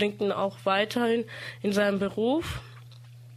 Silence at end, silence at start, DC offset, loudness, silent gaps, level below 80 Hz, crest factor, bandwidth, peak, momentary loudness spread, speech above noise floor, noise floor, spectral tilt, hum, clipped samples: 0 s; 0 s; under 0.1%; -27 LUFS; none; -54 dBFS; 18 dB; 15 kHz; -10 dBFS; 13 LU; 20 dB; -47 dBFS; -5.5 dB/octave; none; under 0.1%